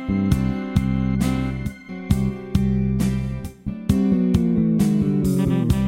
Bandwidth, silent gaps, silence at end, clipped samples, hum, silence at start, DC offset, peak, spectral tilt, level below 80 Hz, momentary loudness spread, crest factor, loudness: 16 kHz; none; 0 s; under 0.1%; none; 0 s; under 0.1%; -4 dBFS; -8 dB/octave; -32 dBFS; 10 LU; 16 dB; -21 LUFS